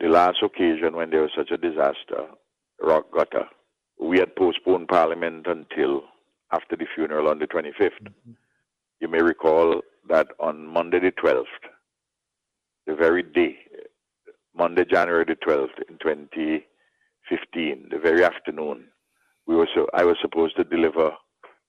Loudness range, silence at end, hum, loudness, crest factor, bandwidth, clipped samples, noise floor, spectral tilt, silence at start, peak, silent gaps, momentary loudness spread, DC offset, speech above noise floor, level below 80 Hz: 3 LU; 0.5 s; none; -23 LUFS; 20 dB; 7.2 kHz; under 0.1%; -84 dBFS; -6 dB/octave; 0 s; -4 dBFS; none; 11 LU; under 0.1%; 61 dB; -62 dBFS